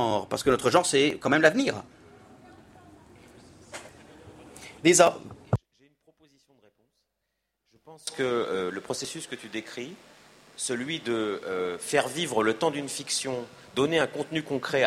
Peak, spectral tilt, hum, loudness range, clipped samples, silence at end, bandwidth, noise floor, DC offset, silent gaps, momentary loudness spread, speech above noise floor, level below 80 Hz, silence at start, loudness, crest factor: -6 dBFS; -3.5 dB/octave; none; 8 LU; under 0.1%; 0 s; 15.5 kHz; -81 dBFS; under 0.1%; none; 19 LU; 54 dB; -60 dBFS; 0 s; -26 LUFS; 24 dB